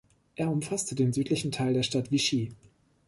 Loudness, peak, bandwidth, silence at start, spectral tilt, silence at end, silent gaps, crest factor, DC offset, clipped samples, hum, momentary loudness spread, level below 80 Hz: -29 LUFS; -14 dBFS; 11.5 kHz; 0.4 s; -5 dB/octave; 0.55 s; none; 16 dB; under 0.1%; under 0.1%; none; 6 LU; -62 dBFS